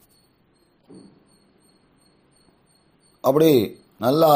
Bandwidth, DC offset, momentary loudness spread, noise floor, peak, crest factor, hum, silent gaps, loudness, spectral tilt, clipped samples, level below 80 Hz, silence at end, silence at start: 15.5 kHz; under 0.1%; 9 LU; -62 dBFS; -4 dBFS; 20 dB; none; none; -20 LUFS; -6.5 dB/octave; under 0.1%; -66 dBFS; 0 s; 3.25 s